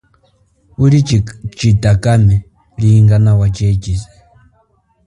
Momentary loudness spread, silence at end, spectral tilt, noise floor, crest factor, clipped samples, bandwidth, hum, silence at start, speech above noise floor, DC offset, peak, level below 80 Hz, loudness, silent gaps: 11 LU; 1.05 s; -7.5 dB/octave; -56 dBFS; 12 dB; under 0.1%; 11 kHz; none; 0.8 s; 46 dB; under 0.1%; 0 dBFS; -30 dBFS; -12 LUFS; none